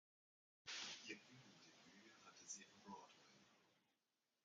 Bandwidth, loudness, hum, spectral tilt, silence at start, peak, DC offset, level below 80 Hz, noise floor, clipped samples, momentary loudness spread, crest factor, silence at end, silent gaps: 9 kHz; -57 LUFS; none; -1 dB/octave; 0.65 s; -38 dBFS; under 0.1%; under -90 dBFS; under -90 dBFS; under 0.1%; 16 LU; 24 dB; 0.5 s; none